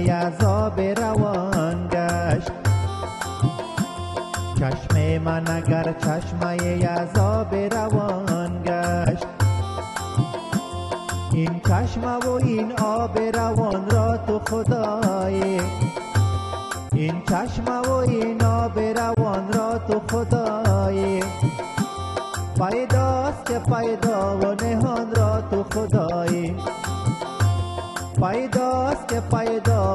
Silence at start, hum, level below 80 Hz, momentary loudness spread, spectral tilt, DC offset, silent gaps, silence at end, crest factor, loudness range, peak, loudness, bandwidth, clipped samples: 0 s; none; -44 dBFS; 6 LU; -6.5 dB/octave; under 0.1%; none; 0 s; 18 dB; 2 LU; -4 dBFS; -23 LUFS; 12.5 kHz; under 0.1%